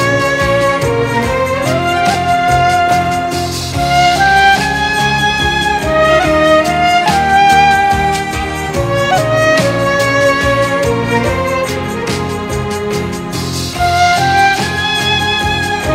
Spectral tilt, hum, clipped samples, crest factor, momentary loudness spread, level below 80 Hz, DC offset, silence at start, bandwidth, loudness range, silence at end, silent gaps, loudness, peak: -4 dB/octave; none; under 0.1%; 12 dB; 8 LU; -30 dBFS; under 0.1%; 0 s; 16 kHz; 4 LU; 0 s; none; -12 LUFS; 0 dBFS